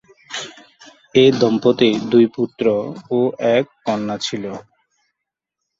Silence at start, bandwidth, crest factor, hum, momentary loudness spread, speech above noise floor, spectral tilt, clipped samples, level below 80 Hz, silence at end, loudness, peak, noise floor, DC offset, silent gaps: 0.3 s; 7.8 kHz; 18 dB; none; 15 LU; 65 dB; -5.5 dB/octave; under 0.1%; -60 dBFS; 1.2 s; -17 LUFS; 0 dBFS; -82 dBFS; under 0.1%; none